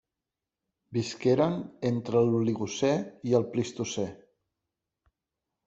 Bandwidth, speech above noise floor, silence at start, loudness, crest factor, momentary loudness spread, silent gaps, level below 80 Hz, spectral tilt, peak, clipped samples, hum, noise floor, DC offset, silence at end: 8 kHz; 61 dB; 0.9 s; -29 LUFS; 20 dB; 8 LU; none; -66 dBFS; -6 dB/octave; -10 dBFS; under 0.1%; none; -89 dBFS; under 0.1%; 1.5 s